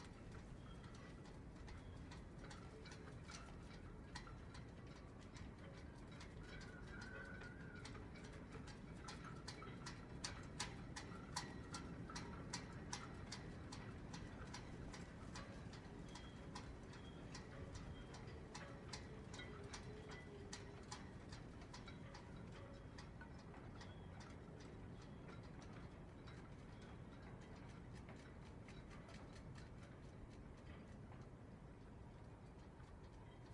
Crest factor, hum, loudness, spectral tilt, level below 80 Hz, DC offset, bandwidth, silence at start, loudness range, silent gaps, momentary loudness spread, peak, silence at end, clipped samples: 24 dB; none; -56 LUFS; -4.5 dB/octave; -64 dBFS; under 0.1%; 11 kHz; 0 s; 6 LU; none; 7 LU; -30 dBFS; 0 s; under 0.1%